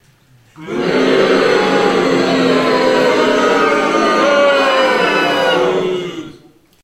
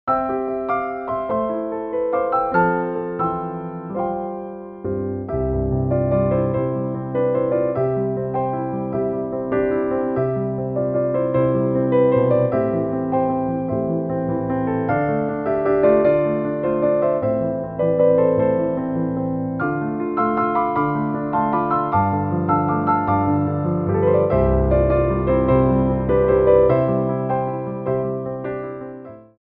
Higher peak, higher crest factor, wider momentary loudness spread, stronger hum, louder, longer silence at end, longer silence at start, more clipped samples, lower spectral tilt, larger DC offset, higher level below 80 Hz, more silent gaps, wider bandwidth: first, 0 dBFS vs -4 dBFS; about the same, 14 dB vs 16 dB; about the same, 7 LU vs 9 LU; neither; first, -13 LUFS vs -20 LUFS; first, 0.5 s vs 0.2 s; first, 0.6 s vs 0.05 s; neither; second, -4.5 dB/octave vs -13 dB/octave; neither; second, -50 dBFS vs -36 dBFS; neither; first, 15 kHz vs 4.3 kHz